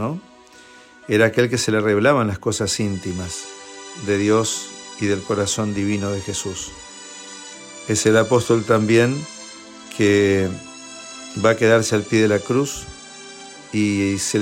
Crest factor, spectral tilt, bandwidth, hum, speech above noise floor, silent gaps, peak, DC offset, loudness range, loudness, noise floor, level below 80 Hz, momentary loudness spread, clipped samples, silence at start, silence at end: 16 dB; -4.5 dB/octave; 16 kHz; none; 27 dB; none; -4 dBFS; under 0.1%; 4 LU; -19 LUFS; -46 dBFS; -56 dBFS; 19 LU; under 0.1%; 0 s; 0 s